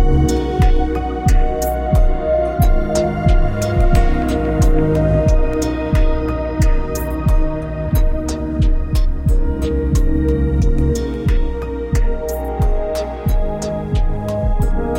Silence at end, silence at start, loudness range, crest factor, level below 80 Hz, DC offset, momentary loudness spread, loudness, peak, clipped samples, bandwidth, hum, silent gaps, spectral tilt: 0 s; 0 s; 4 LU; 14 dB; -16 dBFS; under 0.1%; 6 LU; -18 LUFS; 0 dBFS; under 0.1%; 16.5 kHz; none; none; -7 dB/octave